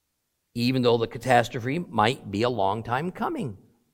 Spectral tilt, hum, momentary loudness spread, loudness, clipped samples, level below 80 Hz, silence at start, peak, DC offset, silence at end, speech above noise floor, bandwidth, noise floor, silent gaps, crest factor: -6 dB/octave; none; 8 LU; -25 LUFS; under 0.1%; -56 dBFS; 0.55 s; -4 dBFS; under 0.1%; 0.4 s; 52 dB; 16.5 kHz; -77 dBFS; none; 22 dB